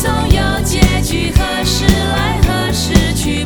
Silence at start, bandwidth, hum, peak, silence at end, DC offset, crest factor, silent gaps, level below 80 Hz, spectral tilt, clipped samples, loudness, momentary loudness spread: 0 s; over 20 kHz; none; 0 dBFS; 0 s; 0.4%; 12 dB; none; -18 dBFS; -4.5 dB/octave; 0.3%; -14 LUFS; 3 LU